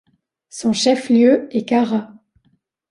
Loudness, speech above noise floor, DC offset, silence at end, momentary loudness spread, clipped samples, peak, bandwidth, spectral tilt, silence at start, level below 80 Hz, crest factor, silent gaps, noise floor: -17 LUFS; 47 dB; under 0.1%; 0.85 s; 10 LU; under 0.1%; -2 dBFS; 11 kHz; -4.5 dB/octave; 0.55 s; -62 dBFS; 16 dB; none; -63 dBFS